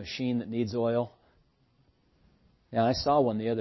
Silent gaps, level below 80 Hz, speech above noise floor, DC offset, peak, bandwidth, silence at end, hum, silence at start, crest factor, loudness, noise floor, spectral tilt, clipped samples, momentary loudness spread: none; -56 dBFS; 39 dB; under 0.1%; -12 dBFS; 6.2 kHz; 0 s; none; 0 s; 18 dB; -29 LUFS; -67 dBFS; -6.5 dB/octave; under 0.1%; 7 LU